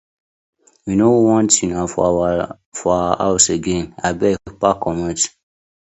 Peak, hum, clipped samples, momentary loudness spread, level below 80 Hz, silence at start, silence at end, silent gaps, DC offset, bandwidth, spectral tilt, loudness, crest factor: 0 dBFS; none; under 0.1%; 9 LU; -42 dBFS; 0.85 s; 0.6 s; 2.66-2.72 s; under 0.1%; 8.4 kHz; -4 dB/octave; -17 LUFS; 18 dB